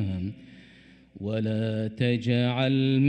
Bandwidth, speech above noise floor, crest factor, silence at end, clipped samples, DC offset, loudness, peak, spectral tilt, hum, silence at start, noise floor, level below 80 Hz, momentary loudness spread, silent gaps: 8.8 kHz; 29 dB; 16 dB; 0 s; under 0.1%; under 0.1%; -27 LUFS; -12 dBFS; -8.5 dB/octave; none; 0 s; -54 dBFS; -62 dBFS; 12 LU; none